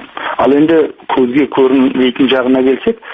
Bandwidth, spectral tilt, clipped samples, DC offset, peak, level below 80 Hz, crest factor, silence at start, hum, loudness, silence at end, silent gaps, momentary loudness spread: 4.7 kHz; -8 dB/octave; under 0.1%; under 0.1%; 0 dBFS; -48 dBFS; 10 dB; 0 s; none; -11 LUFS; 0 s; none; 5 LU